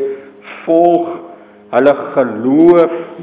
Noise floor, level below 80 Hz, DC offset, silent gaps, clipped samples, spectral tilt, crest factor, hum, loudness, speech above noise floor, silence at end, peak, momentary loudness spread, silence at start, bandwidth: -33 dBFS; -60 dBFS; under 0.1%; none; 0.3%; -11 dB/octave; 12 dB; none; -12 LUFS; 22 dB; 0 s; 0 dBFS; 19 LU; 0 s; 4 kHz